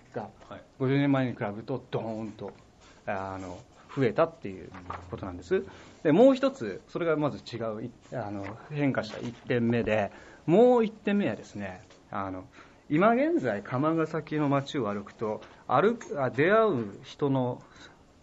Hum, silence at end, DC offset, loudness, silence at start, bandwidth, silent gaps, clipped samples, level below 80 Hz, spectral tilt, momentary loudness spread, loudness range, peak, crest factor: none; 0.35 s; under 0.1%; -28 LUFS; 0.15 s; 8 kHz; none; under 0.1%; -62 dBFS; -7.5 dB/octave; 18 LU; 6 LU; -10 dBFS; 20 dB